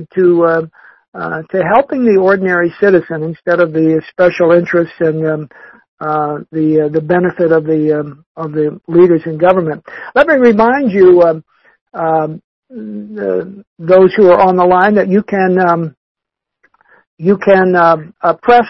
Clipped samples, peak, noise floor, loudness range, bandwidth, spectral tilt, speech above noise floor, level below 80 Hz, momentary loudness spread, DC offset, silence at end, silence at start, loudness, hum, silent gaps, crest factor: under 0.1%; 0 dBFS; -60 dBFS; 4 LU; 6 kHz; -9 dB/octave; 49 dB; -50 dBFS; 15 LU; under 0.1%; 0 s; 0 s; -11 LUFS; none; 1.08-1.12 s, 5.88-5.98 s, 8.26-8.35 s, 11.81-11.86 s, 12.44-12.62 s, 13.67-13.76 s, 15.97-16.15 s, 17.07-17.17 s; 12 dB